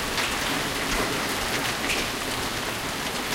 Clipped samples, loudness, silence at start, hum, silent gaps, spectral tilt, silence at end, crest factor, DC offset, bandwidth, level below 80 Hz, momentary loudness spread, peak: under 0.1%; -26 LUFS; 0 s; none; none; -2 dB/octave; 0 s; 16 dB; under 0.1%; 17 kHz; -42 dBFS; 3 LU; -12 dBFS